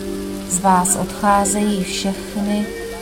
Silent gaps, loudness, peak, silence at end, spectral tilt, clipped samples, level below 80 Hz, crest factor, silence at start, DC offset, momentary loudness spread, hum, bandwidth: none; -18 LUFS; -2 dBFS; 0 s; -4 dB/octave; under 0.1%; -40 dBFS; 16 dB; 0 s; under 0.1%; 10 LU; none; 16.5 kHz